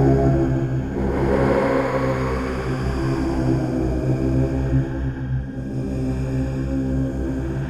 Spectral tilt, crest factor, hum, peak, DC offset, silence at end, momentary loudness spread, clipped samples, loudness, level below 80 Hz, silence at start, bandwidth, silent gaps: -8.5 dB/octave; 14 dB; none; -6 dBFS; under 0.1%; 0 s; 7 LU; under 0.1%; -22 LUFS; -30 dBFS; 0 s; 10.5 kHz; none